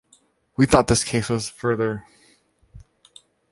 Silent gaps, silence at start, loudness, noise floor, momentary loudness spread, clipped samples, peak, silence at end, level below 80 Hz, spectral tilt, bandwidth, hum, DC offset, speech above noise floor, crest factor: none; 0.6 s; -21 LUFS; -60 dBFS; 12 LU; under 0.1%; -2 dBFS; 0.7 s; -42 dBFS; -5 dB/octave; 11.5 kHz; none; under 0.1%; 40 dB; 22 dB